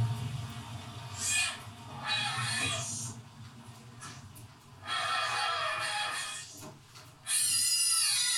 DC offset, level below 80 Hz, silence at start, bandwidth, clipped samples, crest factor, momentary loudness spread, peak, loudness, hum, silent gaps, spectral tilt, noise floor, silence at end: under 0.1%; -68 dBFS; 0 s; 18 kHz; under 0.1%; 18 dB; 24 LU; -16 dBFS; -30 LUFS; none; none; -1 dB/octave; -53 dBFS; 0 s